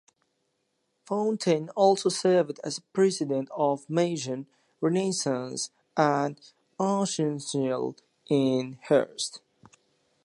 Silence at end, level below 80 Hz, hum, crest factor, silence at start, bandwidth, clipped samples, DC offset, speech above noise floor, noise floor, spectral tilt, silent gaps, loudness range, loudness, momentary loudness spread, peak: 0.85 s; -78 dBFS; none; 20 dB; 1.1 s; 11.5 kHz; under 0.1%; under 0.1%; 50 dB; -76 dBFS; -5 dB/octave; none; 3 LU; -27 LUFS; 10 LU; -8 dBFS